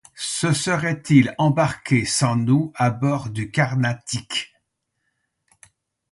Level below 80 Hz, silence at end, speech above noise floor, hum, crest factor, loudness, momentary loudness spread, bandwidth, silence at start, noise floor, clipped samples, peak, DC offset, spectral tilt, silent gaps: -54 dBFS; 1.65 s; 55 dB; none; 20 dB; -21 LUFS; 9 LU; 11.5 kHz; 0.15 s; -75 dBFS; under 0.1%; -2 dBFS; under 0.1%; -5 dB/octave; none